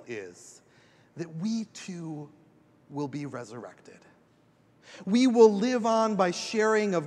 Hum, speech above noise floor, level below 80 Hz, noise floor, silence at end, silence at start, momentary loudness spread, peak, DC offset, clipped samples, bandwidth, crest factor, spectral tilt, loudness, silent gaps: none; 36 dB; -80 dBFS; -63 dBFS; 0 s; 0.1 s; 22 LU; -8 dBFS; under 0.1%; under 0.1%; 10.5 kHz; 22 dB; -5.5 dB/octave; -26 LUFS; none